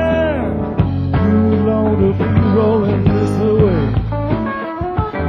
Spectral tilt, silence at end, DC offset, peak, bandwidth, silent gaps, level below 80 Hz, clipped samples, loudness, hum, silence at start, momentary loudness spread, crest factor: -9.5 dB/octave; 0 s; under 0.1%; 0 dBFS; 9.8 kHz; none; -26 dBFS; under 0.1%; -15 LUFS; none; 0 s; 6 LU; 14 dB